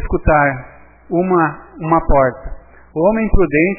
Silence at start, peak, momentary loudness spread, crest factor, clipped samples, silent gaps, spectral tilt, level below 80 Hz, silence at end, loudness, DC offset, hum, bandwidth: 0 s; 0 dBFS; 14 LU; 14 dB; under 0.1%; none; -13 dB/octave; -26 dBFS; 0 s; -15 LUFS; under 0.1%; none; 2.9 kHz